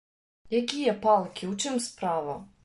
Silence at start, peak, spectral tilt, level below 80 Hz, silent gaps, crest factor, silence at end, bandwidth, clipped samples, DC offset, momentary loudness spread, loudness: 0.45 s; -10 dBFS; -4 dB/octave; -66 dBFS; none; 18 dB; 0.2 s; 11.5 kHz; under 0.1%; under 0.1%; 8 LU; -28 LUFS